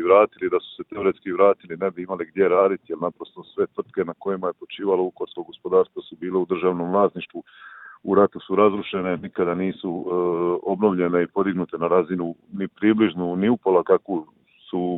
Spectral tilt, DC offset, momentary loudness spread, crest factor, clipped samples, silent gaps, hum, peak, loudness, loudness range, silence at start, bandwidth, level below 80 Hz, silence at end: -11 dB/octave; under 0.1%; 12 LU; 20 dB; under 0.1%; none; none; -2 dBFS; -22 LUFS; 3 LU; 0 s; 4.1 kHz; -64 dBFS; 0 s